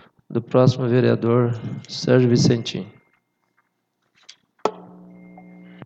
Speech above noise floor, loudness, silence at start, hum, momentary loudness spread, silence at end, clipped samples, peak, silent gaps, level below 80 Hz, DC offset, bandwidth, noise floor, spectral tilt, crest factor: 53 dB; -20 LUFS; 0.3 s; 60 Hz at -40 dBFS; 13 LU; 1 s; under 0.1%; -2 dBFS; none; -60 dBFS; under 0.1%; 8 kHz; -72 dBFS; -6.5 dB/octave; 20 dB